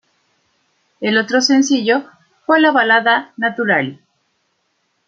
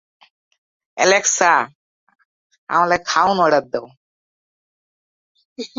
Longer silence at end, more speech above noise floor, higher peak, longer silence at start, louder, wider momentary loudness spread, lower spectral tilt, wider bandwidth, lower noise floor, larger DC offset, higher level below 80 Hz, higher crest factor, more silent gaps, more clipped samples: first, 1.15 s vs 0.1 s; second, 52 dB vs over 74 dB; about the same, -2 dBFS vs 0 dBFS; about the same, 1 s vs 0.95 s; about the same, -15 LUFS vs -16 LUFS; second, 9 LU vs 15 LU; first, -3.5 dB/octave vs -2 dB/octave; about the same, 7.8 kHz vs 7.8 kHz; second, -66 dBFS vs under -90 dBFS; neither; second, -70 dBFS vs -62 dBFS; about the same, 16 dB vs 20 dB; second, none vs 1.75-2.07 s, 2.25-2.50 s, 2.58-2.67 s, 3.97-5.35 s, 5.45-5.56 s; neither